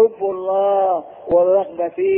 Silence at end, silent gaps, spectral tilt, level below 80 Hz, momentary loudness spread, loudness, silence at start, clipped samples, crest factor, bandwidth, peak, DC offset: 0 s; none; -10.5 dB/octave; -56 dBFS; 8 LU; -18 LUFS; 0 s; under 0.1%; 12 dB; 3.5 kHz; -4 dBFS; under 0.1%